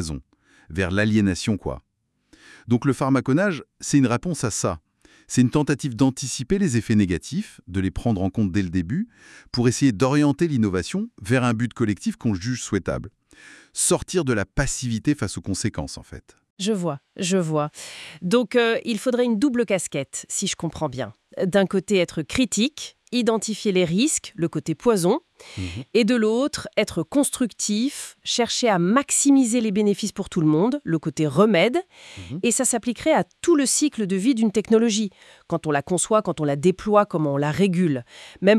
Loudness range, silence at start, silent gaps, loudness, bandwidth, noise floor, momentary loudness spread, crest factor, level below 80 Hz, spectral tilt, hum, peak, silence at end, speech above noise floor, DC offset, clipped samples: 4 LU; 0 s; 16.50-16.57 s; -22 LUFS; 12 kHz; -59 dBFS; 10 LU; 20 dB; -48 dBFS; -5 dB/octave; none; -2 dBFS; 0 s; 37 dB; under 0.1%; under 0.1%